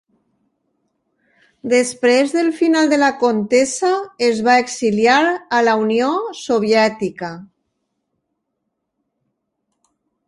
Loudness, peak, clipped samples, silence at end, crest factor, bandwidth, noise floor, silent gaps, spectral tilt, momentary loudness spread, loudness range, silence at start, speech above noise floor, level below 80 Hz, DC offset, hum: -16 LUFS; 0 dBFS; under 0.1%; 2.85 s; 18 dB; 11.5 kHz; -75 dBFS; none; -4 dB/octave; 9 LU; 7 LU; 1.65 s; 59 dB; -64 dBFS; under 0.1%; none